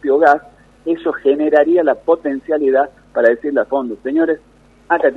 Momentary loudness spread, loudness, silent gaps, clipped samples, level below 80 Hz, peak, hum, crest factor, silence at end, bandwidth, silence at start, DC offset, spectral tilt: 8 LU; -16 LUFS; none; under 0.1%; -54 dBFS; 0 dBFS; none; 16 dB; 0 s; 6.8 kHz; 0.05 s; under 0.1%; -6.5 dB/octave